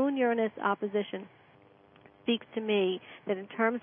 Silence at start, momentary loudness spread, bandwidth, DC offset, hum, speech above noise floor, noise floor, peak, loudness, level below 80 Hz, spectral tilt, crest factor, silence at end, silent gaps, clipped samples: 0 s; 10 LU; 3.7 kHz; under 0.1%; none; 29 dB; -60 dBFS; -14 dBFS; -31 LUFS; -82 dBFS; -9 dB/octave; 18 dB; 0.05 s; none; under 0.1%